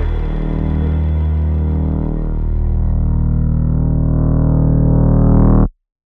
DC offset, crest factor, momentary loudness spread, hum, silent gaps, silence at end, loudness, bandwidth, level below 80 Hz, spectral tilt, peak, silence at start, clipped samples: under 0.1%; 12 dB; 8 LU; none; none; 0.35 s; -16 LUFS; 3.6 kHz; -18 dBFS; -12.5 dB/octave; -2 dBFS; 0 s; under 0.1%